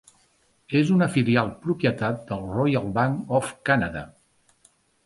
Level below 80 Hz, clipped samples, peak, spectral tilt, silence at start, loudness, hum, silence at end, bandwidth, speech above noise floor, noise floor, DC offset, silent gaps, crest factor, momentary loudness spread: -52 dBFS; under 0.1%; -6 dBFS; -7 dB/octave; 0.7 s; -24 LUFS; none; 0.95 s; 11.5 kHz; 41 dB; -64 dBFS; under 0.1%; none; 20 dB; 10 LU